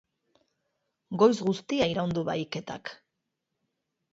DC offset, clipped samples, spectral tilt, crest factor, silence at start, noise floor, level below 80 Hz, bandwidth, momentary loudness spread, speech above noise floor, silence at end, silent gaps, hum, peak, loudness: under 0.1%; under 0.1%; -6 dB/octave; 22 dB; 1.1 s; -83 dBFS; -64 dBFS; 7.8 kHz; 16 LU; 56 dB; 1.2 s; none; none; -8 dBFS; -27 LUFS